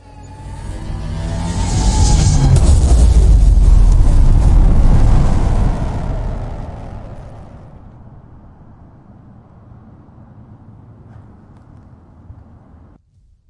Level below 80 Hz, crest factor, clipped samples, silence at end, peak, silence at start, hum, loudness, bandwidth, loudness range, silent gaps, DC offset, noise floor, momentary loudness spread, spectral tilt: -14 dBFS; 12 dB; under 0.1%; 1.15 s; 0 dBFS; 0.25 s; none; -14 LUFS; 11 kHz; 18 LU; none; under 0.1%; -51 dBFS; 21 LU; -6 dB/octave